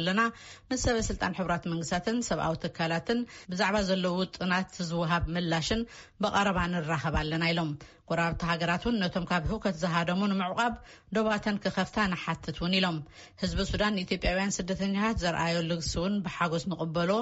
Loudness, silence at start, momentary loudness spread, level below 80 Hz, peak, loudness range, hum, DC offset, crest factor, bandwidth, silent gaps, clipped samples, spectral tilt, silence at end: -30 LUFS; 0 s; 5 LU; -44 dBFS; -12 dBFS; 1 LU; none; under 0.1%; 16 dB; 8 kHz; none; under 0.1%; -4 dB/octave; 0 s